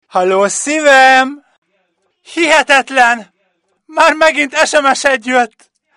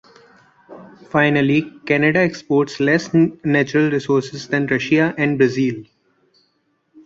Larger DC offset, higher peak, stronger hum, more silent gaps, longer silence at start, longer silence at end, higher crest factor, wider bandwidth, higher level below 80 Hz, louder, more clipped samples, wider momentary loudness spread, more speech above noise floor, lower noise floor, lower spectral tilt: neither; about the same, 0 dBFS vs -2 dBFS; neither; first, 1.58-1.62 s vs none; second, 0.15 s vs 0.7 s; first, 0.5 s vs 0.05 s; about the same, 12 dB vs 16 dB; first, 14 kHz vs 7.6 kHz; about the same, -54 dBFS vs -58 dBFS; first, -10 LUFS vs -18 LUFS; first, 0.6% vs under 0.1%; first, 11 LU vs 6 LU; first, 52 dB vs 48 dB; about the same, -63 dBFS vs -66 dBFS; second, -1.5 dB/octave vs -6.5 dB/octave